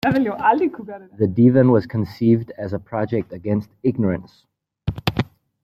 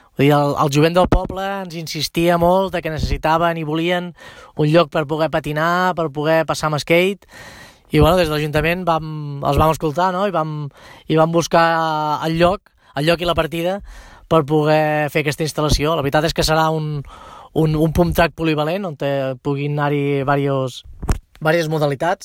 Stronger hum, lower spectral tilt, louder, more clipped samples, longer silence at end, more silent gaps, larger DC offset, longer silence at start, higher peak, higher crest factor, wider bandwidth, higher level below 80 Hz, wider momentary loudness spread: neither; first, -9 dB/octave vs -6 dB/octave; about the same, -20 LUFS vs -18 LUFS; neither; first, 0.4 s vs 0 s; neither; neither; second, 0.05 s vs 0.2 s; about the same, -2 dBFS vs -2 dBFS; about the same, 18 dB vs 16 dB; about the same, 15.5 kHz vs 16.5 kHz; second, -48 dBFS vs -32 dBFS; first, 14 LU vs 11 LU